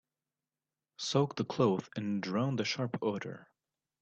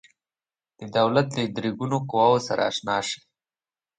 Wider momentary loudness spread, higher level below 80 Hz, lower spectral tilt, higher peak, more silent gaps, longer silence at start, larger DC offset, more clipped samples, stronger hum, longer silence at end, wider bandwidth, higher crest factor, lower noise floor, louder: about the same, 10 LU vs 9 LU; second, -74 dBFS vs -66 dBFS; about the same, -5.5 dB/octave vs -5 dB/octave; second, -16 dBFS vs -6 dBFS; neither; first, 1 s vs 0.8 s; neither; neither; neither; second, 0.55 s vs 0.85 s; second, 8.4 kHz vs 9.6 kHz; about the same, 20 dB vs 20 dB; about the same, under -90 dBFS vs under -90 dBFS; second, -34 LUFS vs -24 LUFS